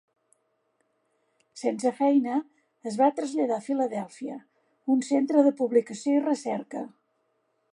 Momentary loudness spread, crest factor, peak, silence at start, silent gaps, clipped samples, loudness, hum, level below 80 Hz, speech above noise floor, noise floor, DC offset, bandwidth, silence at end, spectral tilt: 15 LU; 20 dB; -8 dBFS; 1.55 s; none; under 0.1%; -26 LUFS; none; -84 dBFS; 48 dB; -73 dBFS; under 0.1%; 11 kHz; 0.85 s; -5.5 dB/octave